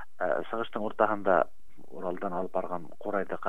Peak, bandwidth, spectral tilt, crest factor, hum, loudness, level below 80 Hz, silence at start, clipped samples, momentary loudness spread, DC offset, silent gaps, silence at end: -8 dBFS; 12.5 kHz; -7.5 dB/octave; 24 dB; none; -31 LUFS; -64 dBFS; 0 s; under 0.1%; 11 LU; 2%; none; 0 s